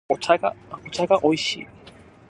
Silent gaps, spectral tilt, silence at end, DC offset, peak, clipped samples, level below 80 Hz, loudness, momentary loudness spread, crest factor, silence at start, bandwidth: none; -4 dB/octave; 0.4 s; under 0.1%; -2 dBFS; under 0.1%; -60 dBFS; -22 LUFS; 16 LU; 22 dB; 0.1 s; 11.5 kHz